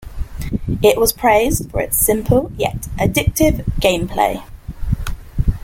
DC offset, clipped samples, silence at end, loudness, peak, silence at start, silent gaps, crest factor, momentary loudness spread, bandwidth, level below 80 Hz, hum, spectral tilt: under 0.1%; under 0.1%; 0 s; -17 LUFS; 0 dBFS; 0 s; none; 16 dB; 13 LU; 17 kHz; -26 dBFS; none; -4.5 dB/octave